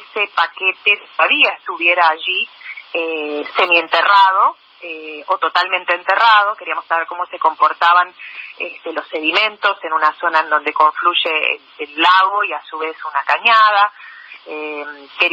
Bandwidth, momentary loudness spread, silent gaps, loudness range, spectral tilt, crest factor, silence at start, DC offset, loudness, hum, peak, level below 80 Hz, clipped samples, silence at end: 8 kHz; 16 LU; none; 2 LU; -1.5 dB/octave; 16 dB; 0 s; under 0.1%; -15 LUFS; none; 0 dBFS; -80 dBFS; under 0.1%; 0 s